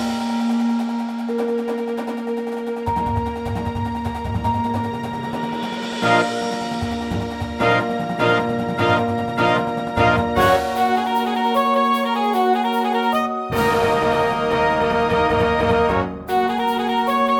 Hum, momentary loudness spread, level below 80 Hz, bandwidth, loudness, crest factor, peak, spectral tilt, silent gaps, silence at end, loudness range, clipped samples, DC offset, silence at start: none; 8 LU; -42 dBFS; 18.5 kHz; -20 LUFS; 16 dB; -4 dBFS; -6 dB/octave; none; 0 s; 6 LU; under 0.1%; under 0.1%; 0 s